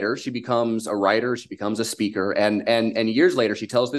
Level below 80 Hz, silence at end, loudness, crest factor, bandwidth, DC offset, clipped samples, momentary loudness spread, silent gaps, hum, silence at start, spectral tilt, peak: -64 dBFS; 0 s; -22 LUFS; 18 dB; 12.5 kHz; under 0.1%; under 0.1%; 8 LU; none; none; 0 s; -4.5 dB/octave; -4 dBFS